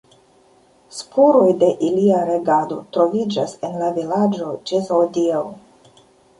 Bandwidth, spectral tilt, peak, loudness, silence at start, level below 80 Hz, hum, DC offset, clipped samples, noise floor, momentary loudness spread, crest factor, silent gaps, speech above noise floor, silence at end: 11.5 kHz; -6.5 dB/octave; -2 dBFS; -18 LUFS; 0.95 s; -64 dBFS; none; under 0.1%; under 0.1%; -53 dBFS; 11 LU; 16 dB; none; 36 dB; 0.8 s